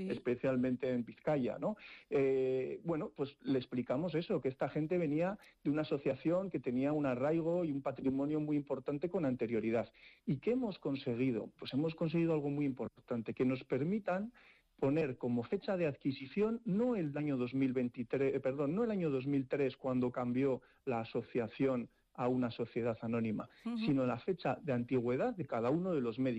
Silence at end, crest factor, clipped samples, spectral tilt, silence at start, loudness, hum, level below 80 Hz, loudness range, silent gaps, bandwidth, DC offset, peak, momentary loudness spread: 0 s; 12 dB; under 0.1%; -9 dB/octave; 0 s; -37 LUFS; none; -70 dBFS; 2 LU; none; 8 kHz; under 0.1%; -24 dBFS; 6 LU